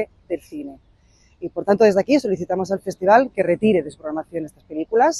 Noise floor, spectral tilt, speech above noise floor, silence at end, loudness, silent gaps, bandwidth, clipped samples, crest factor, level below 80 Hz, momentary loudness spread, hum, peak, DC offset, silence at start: -55 dBFS; -6 dB/octave; 36 dB; 0 s; -20 LUFS; none; 12.5 kHz; under 0.1%; 18 dB; -56 dBFS; 16 LU; none; -2 dBFS; under 0.1%; 0 s